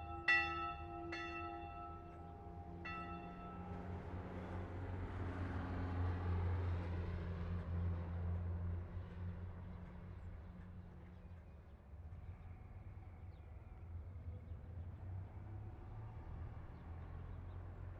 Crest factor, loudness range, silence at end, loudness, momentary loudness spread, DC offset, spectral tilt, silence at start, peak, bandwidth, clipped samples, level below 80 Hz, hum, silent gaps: 22 dB; 12 LU; 0 s; -46 LUFS; 14 LU; under 0.1%; -7.5 dB/octave; 0 s; -22 dBFS; 6.4 kHz; under 0.1%; -54 dBFS; none; none